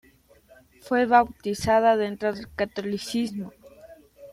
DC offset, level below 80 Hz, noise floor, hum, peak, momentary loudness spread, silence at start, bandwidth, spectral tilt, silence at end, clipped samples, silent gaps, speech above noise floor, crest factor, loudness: under 0.1%; -54 dBFS; -56 dBFS; none; -6 dBFS; 11 LU; 0.85 s; 15.5 kHz; -5 dB/octave; 0 s; under 0.1%; none; 33 dB; 20 dB; -24 LUFS